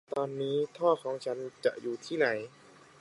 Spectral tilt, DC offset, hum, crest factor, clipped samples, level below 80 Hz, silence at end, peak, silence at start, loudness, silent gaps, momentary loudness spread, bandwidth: -5.5 dB/octave; under 0.1%; none; 18 dB; under 0.1%; -82 dBFS; 0.55 s; -14 dBFS; 0.1 s; -32 LUFS; none; 9 LU; 11.5 kHz